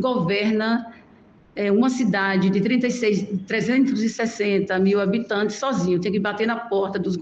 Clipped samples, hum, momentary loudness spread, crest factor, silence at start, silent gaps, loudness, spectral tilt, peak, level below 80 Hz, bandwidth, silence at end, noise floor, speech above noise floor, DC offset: under 0.1%; none; 5 LU; 14 dB; 0 s; none; -22 LUFS; -6 dB/octave; -8 dBFS; -62 dBFS; 8.2 kHz; 0 s; -51 dBFS; 30 dB; under 0.1%